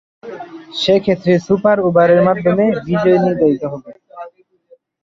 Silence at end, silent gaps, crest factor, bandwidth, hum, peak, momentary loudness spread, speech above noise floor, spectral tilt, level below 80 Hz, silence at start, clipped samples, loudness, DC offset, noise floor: 0.75 s; none; 14 dB; 7.6 kHz; none; 0 dBFS; 21 LU; 37 dB; -7 dB/octave; -52 dBFS; 0.25 s; under 0.1%; -14 LUFS; under 0.1%; -51 dBFS